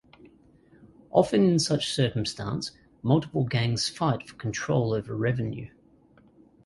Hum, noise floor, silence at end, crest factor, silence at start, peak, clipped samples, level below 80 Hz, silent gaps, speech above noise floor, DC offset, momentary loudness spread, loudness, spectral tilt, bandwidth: none; -58 dBFS; 1 s; 22 dB; 1.15 s; -6 dBFS; under 0.1%; -56 dBFS; none; 33 dB; under 0.1%; 12 LU; -26 LUFS; -5.5 dB/octave; 11.5 kHz